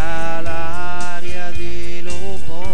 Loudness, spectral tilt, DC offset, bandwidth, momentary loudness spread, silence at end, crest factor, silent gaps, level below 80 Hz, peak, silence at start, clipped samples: -28 LUFS; -5 dB/octave; 50%; 10 kHz; 5 LU; 0 s; 14 dB; none; -36 dBFS; -2 dBFS; 0 s; under 0.1%